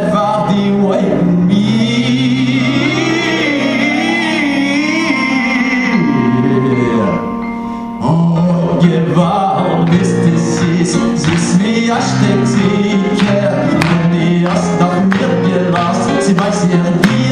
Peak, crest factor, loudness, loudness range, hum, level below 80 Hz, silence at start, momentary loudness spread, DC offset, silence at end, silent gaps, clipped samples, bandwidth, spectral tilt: 0 dBFS; 12 dB; -12 LUFS; 1 LU; none; -44 dBFS; 0 s; 2 LU; under 0.1%; 0 s; none; under 0.1%; 10.5 kHz; -6 dB/octave